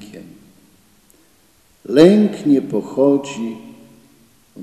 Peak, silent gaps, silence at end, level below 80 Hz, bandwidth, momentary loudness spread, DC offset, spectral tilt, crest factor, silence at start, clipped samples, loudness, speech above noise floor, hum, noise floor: 0 dBFS; none; 0 s; -62 dBFS; 13 kHz; 18 LU; under 0.1%; -7 dB/octave; 18 dB; 0 s; 0.2%; -15 LUFS; 41 dB; none; -55 dBFS